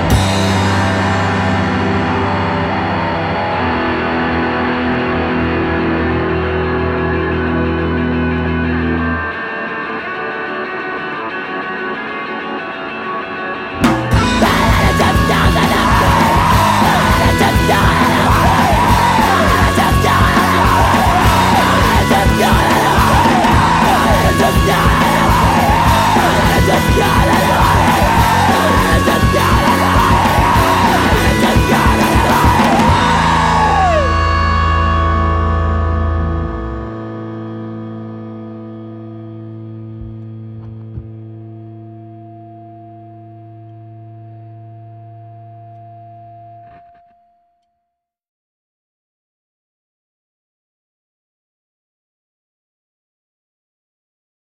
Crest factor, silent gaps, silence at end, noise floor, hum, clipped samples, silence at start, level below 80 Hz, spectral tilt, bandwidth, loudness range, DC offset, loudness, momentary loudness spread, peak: 12 dB; none; 7.8 s; -75 dBFS; none; under 0.1%; 0 s; -24 dBFS; -5.5 dB/octave; 16.5 kHz; 17 LU; under 0.1%; -13 LUFS; 15 LU; -2 dBFS